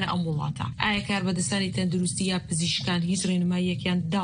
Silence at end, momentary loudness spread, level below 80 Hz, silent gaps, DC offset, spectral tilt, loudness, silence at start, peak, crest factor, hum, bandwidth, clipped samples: 0 s; 2 LU; -52 dBFS; none; under 0.1%; -4.5 dB/octave; -26 LUFS; 0 s; -6 dBFS; 20 dB; none; 10.5 kHz; under 0.1%